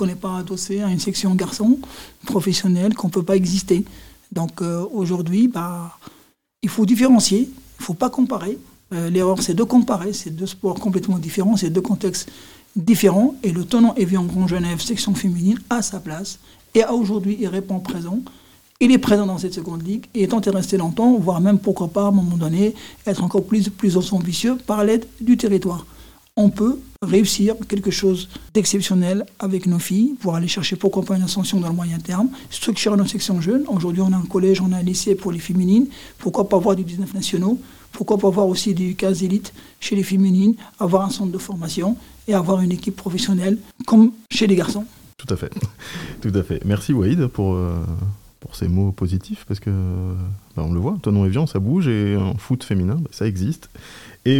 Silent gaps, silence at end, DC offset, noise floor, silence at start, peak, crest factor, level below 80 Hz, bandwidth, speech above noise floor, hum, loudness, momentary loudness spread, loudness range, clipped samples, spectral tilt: none; 0 s; 0.2%; -55 dBFS; 0 s; -2 dBFS; 18 dB; -48 dBFS; 17.5 kHz; 36 dB; none; -20 LUFS; 11 LU; 3 LU; under 0.1%; -6 dB/octave